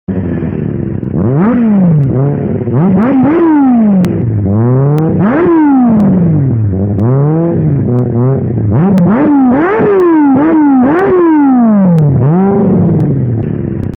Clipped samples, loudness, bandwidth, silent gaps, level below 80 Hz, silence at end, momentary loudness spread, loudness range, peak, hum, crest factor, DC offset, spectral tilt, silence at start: under 0.1%; -9 LUFS; 4.4 kHz; none; -36 dBFS; 0 s; 7 LU; 3 LU; 0 dBFS; none; 8 dB; under 0.1%; -11.5 dB/octave; 0.1 s